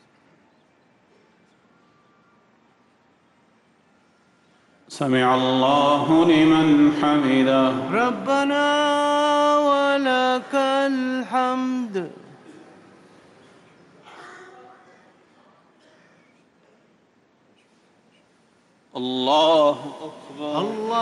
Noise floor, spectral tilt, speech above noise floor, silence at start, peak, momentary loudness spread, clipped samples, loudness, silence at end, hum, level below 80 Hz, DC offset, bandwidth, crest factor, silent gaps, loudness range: -61 dBFS; -5.5 dB/octave; 41 dB; 4.9 s; -8 dBFS; 16 LU; under 0.1%; -19 LUFS; 0 s; none; -64 dBFS; under 0.1%; 11.5 kHz; 14 dB; none; 12 LU